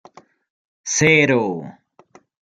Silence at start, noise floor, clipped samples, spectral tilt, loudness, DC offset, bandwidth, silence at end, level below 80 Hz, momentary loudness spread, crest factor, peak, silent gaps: 0.85 s; -52 dBFS; under 0.1%; -4 dB/octave; -16 LUFS; under 0.1%; 11 kHz; 0.8 s; -58 dBFS; 20 LU; 20 dB; -2 dBFS; none